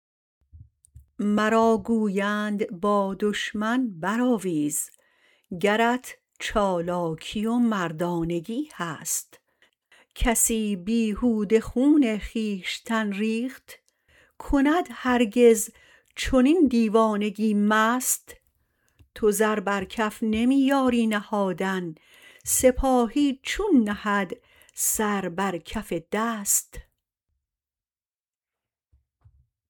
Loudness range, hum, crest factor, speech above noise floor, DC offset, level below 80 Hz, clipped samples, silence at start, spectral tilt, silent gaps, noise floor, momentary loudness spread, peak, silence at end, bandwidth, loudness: 5 LU; none; 18 dB; over 66 dB; under 0.1%; -44 dBFS; under 0.1%; 0.55 s; -4 dB/octave; none; under -90 dBFS; 10 LU; -6 dBFS; 2.9 s; 19 kHz; -24 LUFS